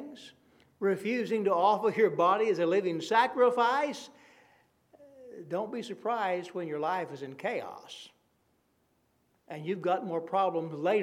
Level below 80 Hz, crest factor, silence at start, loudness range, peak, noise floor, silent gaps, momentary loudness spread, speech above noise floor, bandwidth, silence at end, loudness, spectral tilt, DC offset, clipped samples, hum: -82 dBFS; 20 dB; 0 s; 11 LU; -10 dBFS; -72 dBFS; none; 19 LU; 43 dB; 13.5 kHz; 0 s; -30 LUFS; -5.5 dB/octave; under 0.1%; under 0.1%; none